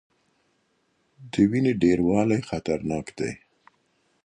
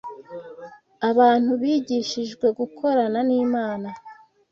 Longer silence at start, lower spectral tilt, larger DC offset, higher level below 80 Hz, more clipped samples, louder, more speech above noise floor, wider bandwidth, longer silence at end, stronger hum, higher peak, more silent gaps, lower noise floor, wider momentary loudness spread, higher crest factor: first, 1.2 s vs 0.05 s; first, -7 dB/octave vs -5 dB/octave; neither; first, -52 dBFS vs -68 dBFS; neither; about the same, -24 LUFS vs -22 LUFS; first, 47 dB vs 22 dB; first, 10 kHz vs 7.2 kHz; first, 0.9 s vs 0.4 s; neither; about the same, -8 dBFS vs -6 dBFS; neither; first, -70 dBFS vs -43 dBFS; second, 11 LU vs 21 LU; about the same, 18 dB vs 18 dB